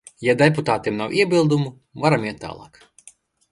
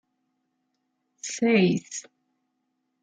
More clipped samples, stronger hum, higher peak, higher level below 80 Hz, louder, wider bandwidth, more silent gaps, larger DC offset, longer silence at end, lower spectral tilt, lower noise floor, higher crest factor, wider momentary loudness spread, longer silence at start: neither; neither; first, 0 dBFS vs -10 dBFS; first, -56 dBFS vs -74 dBFS; first, -20 LUFS vs -24 LUFS; first, 11.5 kHz vs 9.4 kHz; neither; neither; second, 0.85 s vs 1 s; about the same, -6 dB/octave vs -5 dB/octave; second, -52 dBFS vs -77 dBFS; about the same, 20 dB vs 20 dB; about the same, 15 LU vs 17 LU; second, 0.2 s vs 1.25 s